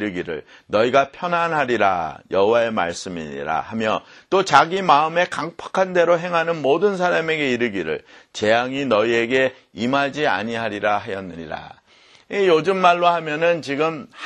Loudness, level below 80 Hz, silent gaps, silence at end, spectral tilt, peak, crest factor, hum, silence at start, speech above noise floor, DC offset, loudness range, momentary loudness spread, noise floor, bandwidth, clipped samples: -20 LUFS; -58 dBFS; none; 0 s; -5 dB/octave; 0 dBFS; 20 dB; none; 0 s; 32 dB; under 0.1%; 3 LU; 12 LU; -52 dBFS; 10.5 kHz; under 0.1%